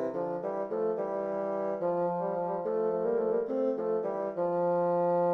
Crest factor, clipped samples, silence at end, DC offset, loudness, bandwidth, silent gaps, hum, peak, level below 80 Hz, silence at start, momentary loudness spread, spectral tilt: 12 dB; under 0.1%; 0 s; under 0.1%; -31 LUFS; 4.7 kHz; none; none; -18 dBFS; -74 dBFS; 0 s; 5 LU; -10 dB/octave